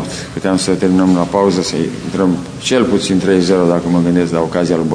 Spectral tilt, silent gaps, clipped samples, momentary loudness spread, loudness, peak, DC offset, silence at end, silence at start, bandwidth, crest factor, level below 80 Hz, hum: -5.5 dB/octave; none; under 0.1%; 6 LU; -14 LUFS; 0 dBFS; under 0.1%; 0 s; 0 s; 10.5 kHz; 14 dB; -42 dBFS; none